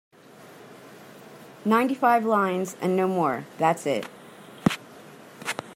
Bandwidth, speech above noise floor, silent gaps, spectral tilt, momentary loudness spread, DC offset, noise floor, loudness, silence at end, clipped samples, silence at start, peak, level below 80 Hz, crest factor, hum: 16 kHz; 25 dB; none; -5.5 dB/octave; 25 LU; under 0.1%; -49 dBFS; -25 LUFS; 0 s; under 0.1%; 0.4 s; -4 dBFS; -68 dBFS; 22 dB; none